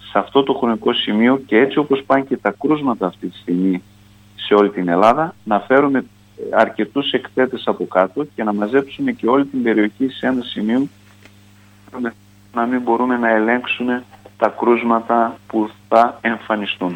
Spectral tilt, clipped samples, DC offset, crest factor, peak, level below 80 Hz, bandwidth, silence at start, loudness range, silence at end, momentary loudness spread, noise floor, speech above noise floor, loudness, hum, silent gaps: -7 dB/octave; under 0.1%; under 0.1%; 16 dB; 0 dBFS; -60 dBFS; 16.5 kHz; 0.05 s; 3 LU; 0 s; 8 LU; -47 dBFS; 30 dB; -18 LUFS; none; none